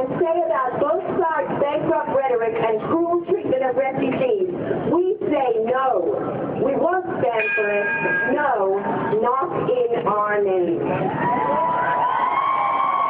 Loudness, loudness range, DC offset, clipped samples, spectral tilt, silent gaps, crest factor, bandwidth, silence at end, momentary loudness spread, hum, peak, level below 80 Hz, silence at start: -21 LUFS; 1 LU; under 0.1%; under 0.1%; -11 dB/octave; none; 12 dB; 4.1 kHz; 0 s; 2 LU; none; -8 dBFS; -60 dBFS; 0 s